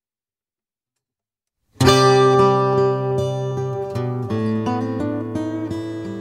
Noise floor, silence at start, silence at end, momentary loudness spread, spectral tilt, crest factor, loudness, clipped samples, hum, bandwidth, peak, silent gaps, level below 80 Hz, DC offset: under -90 dBFS; 1.8 s; 0 s; 12 LU; -6 dB/octave; 18 dB; -19 LUFS; under 0.1%; none; 15.5 kHz; -2 dBFS; none; -48 dBFS; under 0.1%